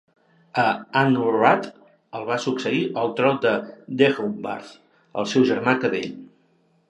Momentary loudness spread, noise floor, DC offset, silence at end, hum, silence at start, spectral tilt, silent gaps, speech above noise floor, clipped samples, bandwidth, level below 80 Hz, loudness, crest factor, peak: 14 LU; -63 dBFS; under 0.1%; 0.65 s; none; 0.55 s; -6 dB/octave; none; 41 dB; under 0.1%; 11 kHz; -70 dBFS; -22 LUFS; 22 dB; -2 dBFS